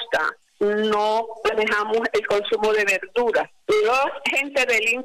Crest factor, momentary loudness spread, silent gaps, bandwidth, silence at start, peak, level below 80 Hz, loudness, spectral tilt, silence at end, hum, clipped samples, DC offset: 8 dB; 5 LU; none; 15.5 kHz; 0 s; -14 dBFS; -58 dBFS; -21 LUFS; -2.5 dB/octave; 0 s; none; under 0.1%; under 0.1%